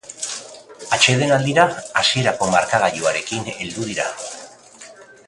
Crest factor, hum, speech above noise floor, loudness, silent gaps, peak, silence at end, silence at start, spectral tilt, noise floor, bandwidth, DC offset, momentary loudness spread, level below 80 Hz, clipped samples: 20 dB; none; 24 dB; -18 LUFS; none; 0 dBFS; 0.15 s; 0.05 s; -3 dB/octave; -43 dBFS; 11.5 kHz; under 0.1%; 17 LU; -56 dBFS; under 0.1%